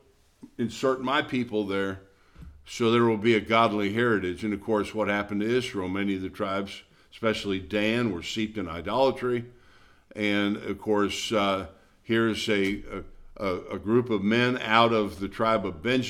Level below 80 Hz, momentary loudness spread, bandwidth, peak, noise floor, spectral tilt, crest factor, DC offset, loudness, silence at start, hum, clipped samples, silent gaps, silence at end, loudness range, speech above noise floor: -54 dBFS; 11 LU; 15 kHz; -4 dBFS; -56 dBFS; -5.5 dB/octave; 22 dB; under 0.1%; -26 LUFS; 0.45 s; none; under 0.1%; none; 0 s; 4 LU; 30 dB